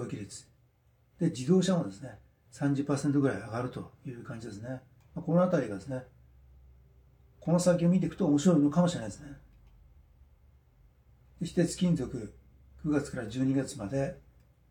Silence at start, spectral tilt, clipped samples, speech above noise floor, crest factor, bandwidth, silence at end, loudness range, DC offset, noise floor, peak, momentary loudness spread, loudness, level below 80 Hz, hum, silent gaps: 0 s; -7 dB/octave; under 0.1%; 37 dB; 20 dB; 12 kHz; 0.5 s; 6 LU; under 0.1%; -67 dBFS; -12 dBFS; 19 LU; -30 LUFS; -58 dBFS; none; none